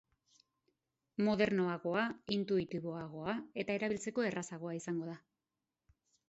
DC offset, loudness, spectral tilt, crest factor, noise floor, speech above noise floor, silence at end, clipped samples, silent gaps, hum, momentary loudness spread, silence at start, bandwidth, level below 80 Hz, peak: under 0.1%; -37 LUFS; -5 dB/octave; 22 dB; under -90 dBFS; over 53 dB; 1.1 s; under 0.1%; none; none; 10 LU; 1.2 s; 8 kHz; -72 dBFS; -16 dBFS